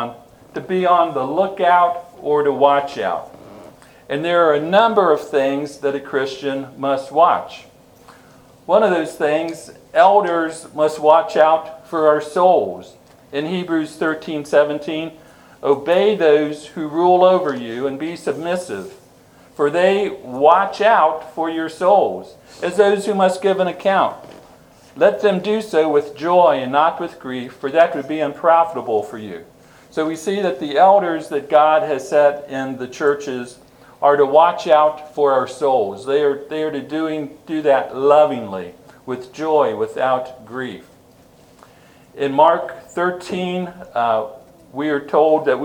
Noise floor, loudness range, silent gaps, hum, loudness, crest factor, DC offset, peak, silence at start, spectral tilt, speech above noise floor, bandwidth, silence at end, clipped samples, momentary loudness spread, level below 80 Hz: -48 dBFS; 4 LU; none; none; -17 LUFS; 18 dB; under 0.1%; 0 dBFS; 0 s; -5.5 dB/octave; 32 dB; 15.5 kHz; 0 s; under 0.1%; 14 LU; -62 dBFS